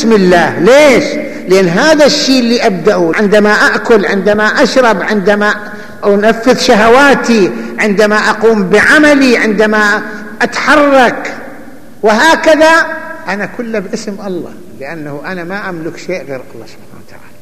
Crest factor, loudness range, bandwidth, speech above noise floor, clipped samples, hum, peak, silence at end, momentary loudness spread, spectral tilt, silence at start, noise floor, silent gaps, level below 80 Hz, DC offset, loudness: 10 dB; 12 LU; 15 kHz; 27 dB; under 0.1%; none; 0 dBFS; 0.25 s; 15 LU; -4.5 dB/octave; 0 s; -35 dBFS; none; -42 dBFS; 4%; -8 LUFS